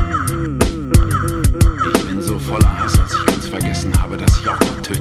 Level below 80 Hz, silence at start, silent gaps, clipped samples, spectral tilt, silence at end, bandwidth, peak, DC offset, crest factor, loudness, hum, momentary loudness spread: -20 dBFS; 0 s; none; under 0.1%; -5.5 dB/octave; 0 s; 13.5 kHz; 0 dBFS; under 0.1%; 16 dB; -17 LUFS; none; 6 LU